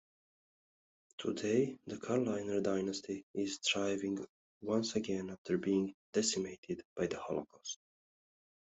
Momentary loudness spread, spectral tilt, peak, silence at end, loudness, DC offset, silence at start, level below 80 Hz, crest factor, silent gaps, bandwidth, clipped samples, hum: 12 LU; -4 dB/octave; -20 dBFS; 1 s; -37 LUFS; under 0.1%; 1.2 s; -76 dBFS; 18 dB; 3.23-3.34 s, 4.29-4.61 s, 5.38-5.45 s, 5.94-6.13 s, 6.58-6.63 s, 6.85-6.96 s; 8.2 kHz; under 0.1%; none